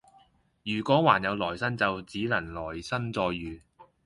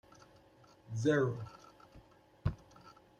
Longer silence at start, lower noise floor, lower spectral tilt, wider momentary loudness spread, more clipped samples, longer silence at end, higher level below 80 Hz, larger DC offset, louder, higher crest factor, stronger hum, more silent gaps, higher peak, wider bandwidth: second, 0.65 s vs 0.9 s; about the same, -62 dBFS vs -63 dBFS; about the same, -6 dB/octave vs -7 dB/octave; second, 14 LU vs 27 LU; neither; about the same, 0.25 s vs 0.3 s; about the same, -54 dBFS vs -58 dBFS; neither; first, -28 LUFS vs -36 LUFS; about the same, 24 dB vs 20 dB; neither; neither; first, -6 dBFS vs -18 dBFS; first, 11.5 kHz vs 10 kHz